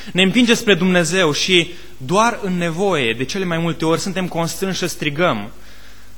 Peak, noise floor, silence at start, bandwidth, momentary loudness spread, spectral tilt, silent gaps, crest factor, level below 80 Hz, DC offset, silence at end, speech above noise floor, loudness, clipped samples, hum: 0 dBFS; -43 dBFS; 0 s; 19 kHz; 8 LU; -4 dB/octave; none; 18 dB; -46 dBFS; 3%; 0.3 s; 25 dB; -17 LUFS; under 0.1%; none